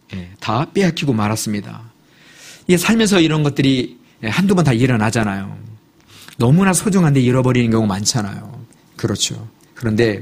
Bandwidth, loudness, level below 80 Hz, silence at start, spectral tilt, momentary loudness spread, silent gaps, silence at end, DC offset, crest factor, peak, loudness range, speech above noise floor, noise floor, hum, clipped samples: 15.5 kHz; -16 LUFS; -46 dBFS; 0.1 s; -5 dB/octave; 15 LU; none; 0 s; under 0.1%; 16 dB; 0 dBFS; 2 LU; 32 dB; -47 dBFS; none; under 0.1%